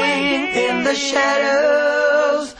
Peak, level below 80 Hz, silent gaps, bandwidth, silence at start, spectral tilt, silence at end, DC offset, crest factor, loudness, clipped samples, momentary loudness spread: -6 dBFS; -56 dBFS; none; 9.6 kHz; 0 s; -2.5 dB/octave; 0.05 s; under 0.1%; 12 dB; -16 LUFS; under 0.1%; 3 LU